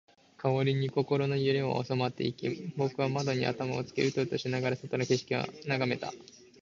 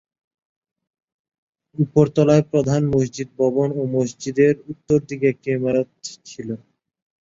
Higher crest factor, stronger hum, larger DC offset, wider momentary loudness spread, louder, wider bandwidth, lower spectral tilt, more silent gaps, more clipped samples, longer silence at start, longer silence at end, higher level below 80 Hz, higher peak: about the same, 18 dB vs 20 dB; neither; neither; second, 6 LU vs 16 LU; second, -31 LUFS vs -20 LUFS; about the same, 7.6 kHz vs 7.8 kHz; about the same, -6 dB/octave vs -7 dB/octave; neither; neither; second, 0.4 s vs 1.8 s; second, 0.4 s vs 0.65 s; second, -68 dBFS vs -54 dBFS; second, -14 dBFS vs -2 dBFS